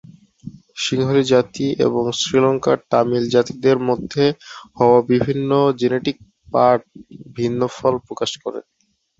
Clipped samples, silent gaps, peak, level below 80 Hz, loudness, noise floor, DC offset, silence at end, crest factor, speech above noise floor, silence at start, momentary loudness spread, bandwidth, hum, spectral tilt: under 0.1%; none; -2 dBFS; -54 dBFS; -18 LUFS; -39 dBFS; under 0.1%; 0.6 s; 16 dB; 21 dB; 0.45 s; 11 LU; 8 kHz; none; -5.5 dB/octave